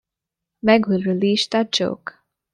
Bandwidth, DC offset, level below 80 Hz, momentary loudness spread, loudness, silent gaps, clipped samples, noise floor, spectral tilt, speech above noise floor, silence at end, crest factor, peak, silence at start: 10.5 kHz; under 0.1%; -62 dBFS; 11 LU; -19 LUFS; none; under 0.1%; -85 dBFS; -5 dB/octave; 66 dB; 0.45 s; 20 dB; -2 dBFS; 0.65 s